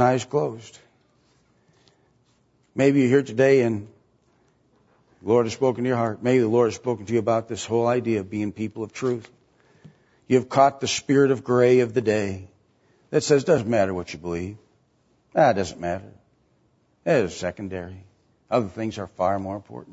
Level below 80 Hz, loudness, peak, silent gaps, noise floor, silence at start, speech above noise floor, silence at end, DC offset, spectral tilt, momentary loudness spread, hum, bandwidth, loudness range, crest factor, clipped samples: -60 dBFS; -23 LUFS; -4 dBFS; none; -64 dBFS; 0 s; 42 dB; 0 s; under 0.1%; -6 dB/octave; 14 LU; none; 8 kHz; 6 LU; 20 dB; under 0.1%